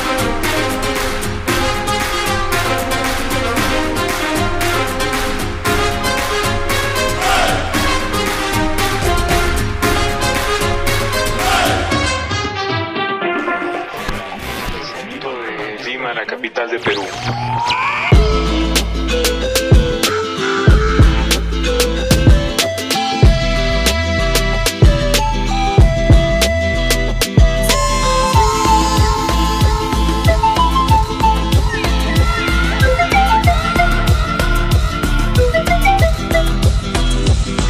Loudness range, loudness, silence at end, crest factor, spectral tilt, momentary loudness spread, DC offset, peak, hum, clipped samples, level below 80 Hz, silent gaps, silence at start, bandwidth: 5 LU; -15 LUFS; 0 s; 14 dB; -4.5 dB/octave; 7 LU; under 0.1%; 0 dBFS; none; under 0.1%; -20 dBFS; none; 0 s; 16 kHz